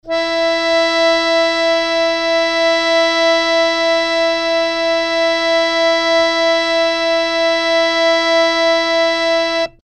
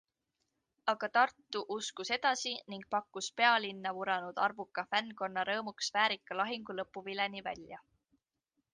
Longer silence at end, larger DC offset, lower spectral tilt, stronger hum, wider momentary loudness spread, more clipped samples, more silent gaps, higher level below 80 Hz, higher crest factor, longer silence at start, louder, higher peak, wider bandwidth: second, 0.15 s vs 0.95 s; neither; about the same, -1.5 dB/octave vs -2 dB/octave; neither; second, 3 LU vs 11 LU; neither; neither; first, -48 dBFS vs -78 dBFS; second, 12 dB vs 22 dB; second, 0.05 s vs 0.85 s; first, -14 LUFS vs -34 LUFS; first, -4 dBFS vs -14 dBFS; about the same, 9.2 kHz vs 9.6 kHz